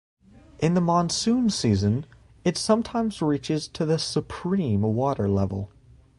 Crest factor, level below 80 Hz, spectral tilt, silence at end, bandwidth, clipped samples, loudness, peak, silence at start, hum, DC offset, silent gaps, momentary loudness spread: 16 dB; -48 dBFS; -6 dB/octave; 0.5 s; 11.5 kHz; under 0.1%; -25 LUFS; -8 dBFS; 0.6 s; none; under 0.1%; none; 7 LU